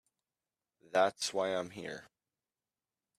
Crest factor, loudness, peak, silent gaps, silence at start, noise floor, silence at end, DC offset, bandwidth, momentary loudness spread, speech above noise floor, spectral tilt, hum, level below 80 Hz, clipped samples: 22 dB; -34 LUFS; -16 dBFS; none; 0.95 s; under -90 dBFS; 1.15 s; under 0.1%; 14.5 kHz; 14 LU; over 56 dB; -2.5 dB/octave; none; -82 dBFS; under 0.1%